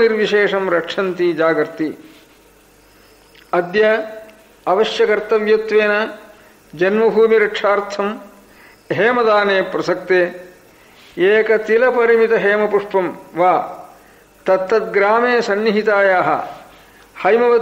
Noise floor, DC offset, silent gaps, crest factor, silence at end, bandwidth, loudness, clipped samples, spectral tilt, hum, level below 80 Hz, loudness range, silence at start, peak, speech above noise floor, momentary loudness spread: -49 dBFS; under 0.1%; none; 14 dB; 0 s; 15 kHz; -16 LUFS; under 0.1%; -5.5 dB/octave; none; -58 dBFS; 4 LU; 0 s; -4 dBFS; 34 dB; 11 LU